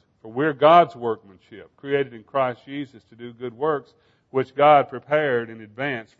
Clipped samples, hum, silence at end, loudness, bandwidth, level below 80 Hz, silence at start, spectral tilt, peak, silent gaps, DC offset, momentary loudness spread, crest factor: under 0.1%; none; 0.15 s; -21 LUFS; 6.4 kHz; -70 dBFS; 0.25 s; -7.5 dB/octave; -2 dBFS; none; under 0.1%; 19 LU; 20 dB